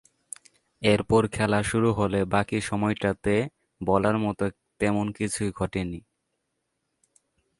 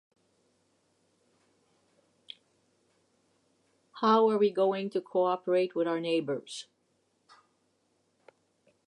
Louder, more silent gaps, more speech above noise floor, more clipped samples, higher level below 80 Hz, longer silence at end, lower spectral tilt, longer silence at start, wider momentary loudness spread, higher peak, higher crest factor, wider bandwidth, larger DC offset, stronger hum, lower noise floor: about the same, -26 LUFS vs -28 LUFS; neither; first, 54 dB vs 46 dB; neither; first, -48 dBFS vs -90 dBFS; second, 1.6 s vs 2.25 s; about the same, -6 dB/octave vs -5.5 dB/octave; second, 0.8 s vs 3.95 s; second, 12 LU vs 24 LU; first, -6 dBFS vs -12 dBFS; about the same, 20 dB vs 22 dB; about the same, 11.5 kHz vs 11.5 kHz; neither; neither; first, -78 dBFS vs -74 dBFS